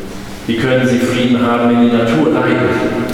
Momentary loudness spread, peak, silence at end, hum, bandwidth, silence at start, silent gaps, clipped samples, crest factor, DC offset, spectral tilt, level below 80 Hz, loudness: 7 LU; -2 dBFS; 0 s; none; 15 kHz; 0 s; none; under 0.1%; 12 dB; under 0.1%; -6.5 dB/octave; -42 dBFS; -13 LUFS